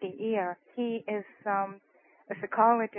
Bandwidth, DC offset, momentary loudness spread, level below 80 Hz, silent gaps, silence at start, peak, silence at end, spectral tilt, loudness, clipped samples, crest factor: 3.6 kHz; under 0.1%; 13 LU; -86 dBFS; none; 0 s; -10 dBFS; 0 s; -0.5 dB/octave; -31 LUFS; under 0.1%; 20 dB